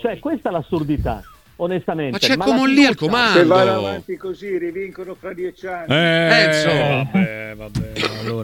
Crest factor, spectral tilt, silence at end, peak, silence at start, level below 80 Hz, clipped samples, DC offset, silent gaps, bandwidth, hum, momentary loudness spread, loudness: 18 dB; -5.5 dB/octave; 0 s; 0 dBFS; 0 s; -42 dBFS; under 0.1%; under 0.1%; none; 17 kHz; none; 15 LU; -17 LUFS